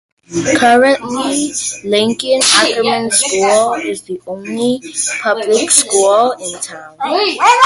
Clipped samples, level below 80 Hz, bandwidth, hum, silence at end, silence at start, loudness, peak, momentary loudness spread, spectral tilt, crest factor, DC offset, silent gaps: under 0.1%; -54 dBFS; 16 kHz; none; 0 s; 0.3 s; -13 LUFS; 0 dBFS; 14 LU; -1.5 dB/octave; 14 dB; under 0.1%; none